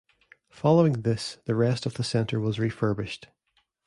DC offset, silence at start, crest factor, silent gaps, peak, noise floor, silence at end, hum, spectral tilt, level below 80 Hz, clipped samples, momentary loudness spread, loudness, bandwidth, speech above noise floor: under 0.1%; 0.55 s; 18 dB; none; -8 dBFS; -72 dBFS; 0.6 s; none; -7 dB/octave; -58 dBFS; under 0.1%; 10 LU; -26 LUFS; 11.5 kHz; 47 dB